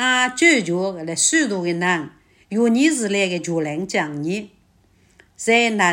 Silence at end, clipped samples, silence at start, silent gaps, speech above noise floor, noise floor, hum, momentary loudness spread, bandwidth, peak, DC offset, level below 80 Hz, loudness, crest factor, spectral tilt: 0 s; under 0.1%; 0 s; none; 38 dB; -57 dBFS; none; 11 LU; 16.5 kHz; -2 dBFS; under 0.1%; -62 dBFS; -19 LUFS; 18 dB; -3 dB/octave